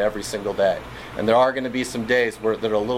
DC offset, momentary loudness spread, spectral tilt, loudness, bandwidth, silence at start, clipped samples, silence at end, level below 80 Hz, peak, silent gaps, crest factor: under 0.1%; 9 LU; -4.5 dB/octave; -22 LUFS; 16 kHz; 0 s; under 0.1%; 0 s; -48 dBFS; -4 dBFS; none; 16 dB